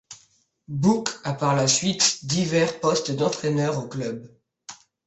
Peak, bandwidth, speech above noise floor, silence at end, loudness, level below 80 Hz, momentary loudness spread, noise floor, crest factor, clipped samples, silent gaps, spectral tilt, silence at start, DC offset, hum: -4 dBFS; 8.4 kHz; 39 dB; 0.35 s; -23 LUFS; -62 dBFS; 15 LU; -62 dBFS; 22 dB; under 0.1%; none; -4 dB/octave; 0.1 s; under 0.1%; none